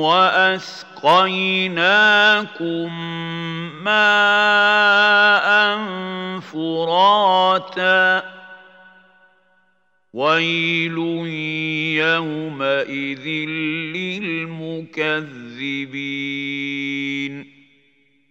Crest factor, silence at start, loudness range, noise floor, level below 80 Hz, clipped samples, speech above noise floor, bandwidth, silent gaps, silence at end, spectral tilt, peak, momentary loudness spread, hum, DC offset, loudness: 18 dB; 0 s; 9 LU; -65 dBFS; -78 dBFS; under 0.1%; 46 dB; 8.2 kHz; none; 0.85 s; -4.5 dB/octave; -2 dBFS; 14 LU; none; under 0.1%; -17 LUFS